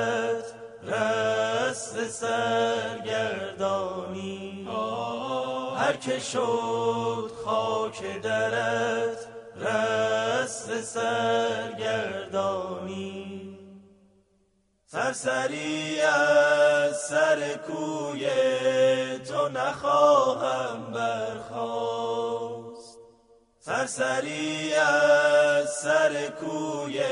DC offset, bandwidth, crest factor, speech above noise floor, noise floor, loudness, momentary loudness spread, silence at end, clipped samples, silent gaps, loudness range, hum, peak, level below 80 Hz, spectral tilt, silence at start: under 0.1%; 11 kHz; 18 dB; 43 dB; -68 dBFS; -26 LUFS; 13 LU; 0 s; under 0.1%; none; 7 LU; none; -8 dBFS; -68 dBFS; -3.5 dB/octave; 0 s